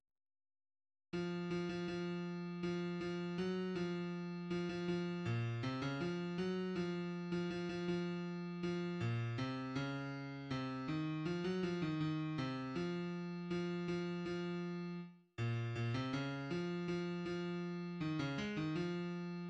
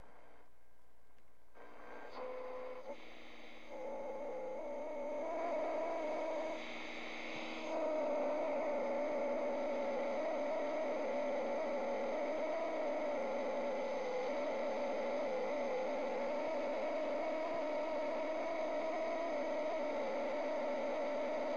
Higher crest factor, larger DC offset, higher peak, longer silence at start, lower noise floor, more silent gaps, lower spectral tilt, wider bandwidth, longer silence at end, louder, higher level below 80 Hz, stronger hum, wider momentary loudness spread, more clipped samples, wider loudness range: about the same, 14 dB vs 12 dB; second, under 0.1% vs 0.4%; about the same, -28 dBFS vs -28 dBFS; first, 1.15 s vs 0 s; first, under -90 dBFS vs -71 dBFS; neither; first, -7 dB/octave vs -4.5 dB/octave; about the same, 8.4 kHz vs 7.8 kHz; about the same, 0 s vs 0 s; about the same, -42 LUFS vs -40 LUFS; about the same, -70 dBFS vs -74 dBFS; neither; second, 4 LU vs 9 LU; neither; second, 1 LU vs 9 LU